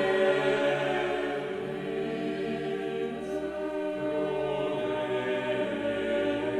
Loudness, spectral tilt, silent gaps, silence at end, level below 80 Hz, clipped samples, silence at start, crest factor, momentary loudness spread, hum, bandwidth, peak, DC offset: -30 LUFS; -6 dB/octave; none; 0 s; -60 dBFS; under 0.1%; 0 s; 16 dB; 7 LU; none; 12 kHz; -14 dBFS; under 0.1%